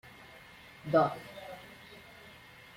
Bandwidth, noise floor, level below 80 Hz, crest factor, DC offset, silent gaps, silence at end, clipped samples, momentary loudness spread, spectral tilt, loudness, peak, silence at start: 16.5 kHz; -54 dBFS; -70 dBFS; 22 dB; under 0.1%; none; 0.5 s; under 0.1%; 24 LU; -6.5 dB/octave; -30 LUFS; -14 dBFS; 0.05 s